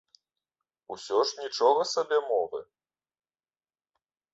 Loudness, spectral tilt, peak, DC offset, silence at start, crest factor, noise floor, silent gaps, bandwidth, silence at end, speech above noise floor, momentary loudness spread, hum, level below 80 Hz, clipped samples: -27 LUFS; -1.5 dB/octave; -10 dBFS; under 0.1%; 0.9 s; 20 dB; under -90 dBFS; none; 8 kHz; 1.7 s; over 63 dB; 17 LU; none; -80 dBFS; under 0.1%